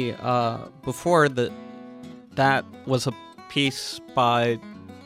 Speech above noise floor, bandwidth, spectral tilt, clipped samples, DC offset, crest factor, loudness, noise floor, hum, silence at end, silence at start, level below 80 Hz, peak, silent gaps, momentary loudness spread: 19 dB; 15.5 kHz; -5 dB/octave; under 0.1%; under 0.1%; 18 dB; -24 LUFS; -42 dBFS; none; 0 s; 0 s; -62 dBFS; -6 dBFS; none; 21 LU